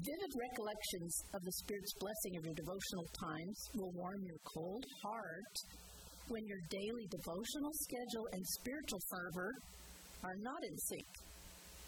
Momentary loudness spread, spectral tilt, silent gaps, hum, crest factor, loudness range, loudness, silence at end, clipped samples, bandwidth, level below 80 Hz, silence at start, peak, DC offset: 11 LU; -3.5 dB/octave; none; none; 16 dB; 3 LU; -46 LUFS; 0 s; under 0.1%; 19 kHz; -66 dBFS; 0 s; -30 dBFS; under 0.1%